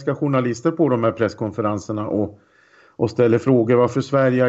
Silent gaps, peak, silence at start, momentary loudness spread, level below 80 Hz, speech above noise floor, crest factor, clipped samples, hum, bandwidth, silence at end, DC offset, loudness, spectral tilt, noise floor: none; -6 dBFS; 0 s; 8 LU; -58 dBFS; 35 dB; 14 dB; under 0.1%; none; 8 kHz; 0 s; under 0.1%; -20 LUFS; -8 dB/octave; -53 dBFS